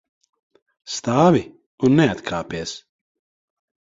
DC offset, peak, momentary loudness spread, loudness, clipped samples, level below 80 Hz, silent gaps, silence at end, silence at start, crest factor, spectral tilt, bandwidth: under 0.1%; -2 dBFS; 16 LU; -20 LUFS; under 0.1%; -54 dBFS; 1.66-1.78 s; 1 s; 0.85 s; 20 dB; -6 dB/octave; 8 kHz